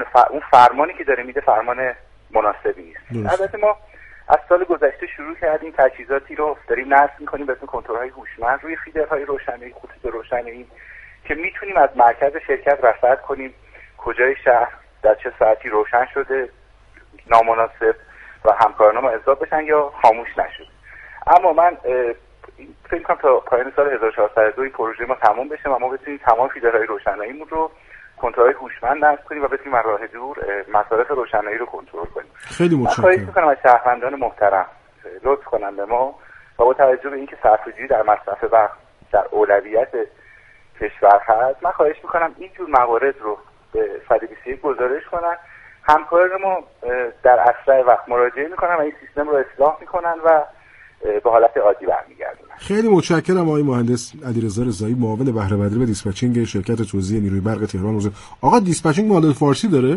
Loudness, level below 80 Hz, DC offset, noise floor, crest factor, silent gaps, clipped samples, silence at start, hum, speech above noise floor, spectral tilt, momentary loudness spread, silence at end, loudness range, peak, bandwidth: -18 LUFS; -46 dBFS; under 0.1%; -48 dBFS; 18 dB; none; under 0.1%; 0 s; none; 31 dB; -6.5 dB/octave; 13 LU; 0 s; 4 LU; 0 dBFS; 11.5 kHz